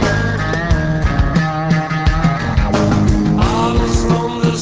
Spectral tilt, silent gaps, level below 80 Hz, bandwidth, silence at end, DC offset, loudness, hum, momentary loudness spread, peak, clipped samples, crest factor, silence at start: -6.5 dB/octave; none; -20 dBFS; 8 kHz; 0 s; under 0.1%; -15 LUFS; none; 3 LU; -2 dBFS; under 0.1%; 14 dB; 0 s